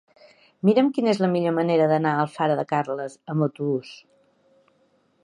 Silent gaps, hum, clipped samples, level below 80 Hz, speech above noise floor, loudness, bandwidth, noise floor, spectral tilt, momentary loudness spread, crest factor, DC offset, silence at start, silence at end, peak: none; none; under 0.1%; -74 dBFS; 42 dB; -23 LUFS; 11 kHz; -64 dBFS; -7.5 dB/octave; 10 LU; 18 dB; under 0.1%; 0.65 s; 1.3 s; -6 dBFS